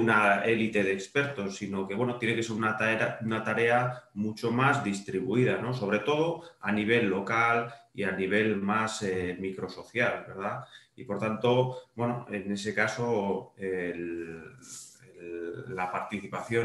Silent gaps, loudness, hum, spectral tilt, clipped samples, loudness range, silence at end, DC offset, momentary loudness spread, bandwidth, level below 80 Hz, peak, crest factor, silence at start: none; -29 LUFS; none; -5.5 dB/octave; under 0.1%; 5 LU; 0 s; under 0.1%; 13 LU; 12 kHz; -68 dBFS; -10 dBFS; 20 dB; 0 s